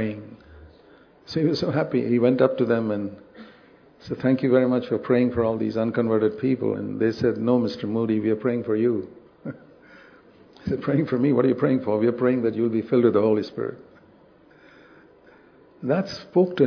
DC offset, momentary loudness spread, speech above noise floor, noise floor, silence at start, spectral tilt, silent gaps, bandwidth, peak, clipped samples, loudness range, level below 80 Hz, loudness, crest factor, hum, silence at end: under 0.1%; 14 LU; 32 dB; -53 dBFS; 0 s; -8.5 dB/octave; none; 5.4 kHz; -4 dBFS; under 0.1%; 5 LU; -60 dBFS; -23 LUFS; 18 dB; none; 0 s